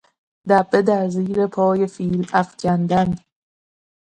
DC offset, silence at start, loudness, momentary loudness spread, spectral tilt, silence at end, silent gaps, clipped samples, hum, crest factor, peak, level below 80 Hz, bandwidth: under 0.1%; 0.45 s; -19 LUFS; 7 LU; -7.5 dB/octave; 0.9 s; none; under 0.1%; none; 18 dB; -2 dBFS; -52 dBFS; 9.2 kHz